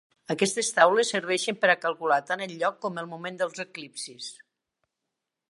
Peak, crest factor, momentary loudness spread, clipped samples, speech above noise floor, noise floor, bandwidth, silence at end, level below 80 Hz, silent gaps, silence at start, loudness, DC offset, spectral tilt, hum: -4 dBFS; 24 dB; 16 LU; under 0.1%; 58 dB; -85 dBFS; 11.5 kHz; 1.15 s; -82 dBFS; none; 0.3 s; -26 LUFS; under 0.1%; -2.5 dB/octave; none